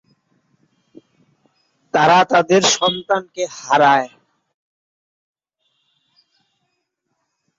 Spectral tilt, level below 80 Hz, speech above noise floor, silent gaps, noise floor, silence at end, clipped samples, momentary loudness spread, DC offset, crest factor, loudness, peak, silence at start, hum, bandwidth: -3 dB/octave; -66 dBFS; 58 dB; none; -73 dBFS; 3.5 s; under 0.1%; 12 LU; under 0.1%; 18 dB; -15 LUFS; -2 dBFS; 1.95 s; none; 8 kHz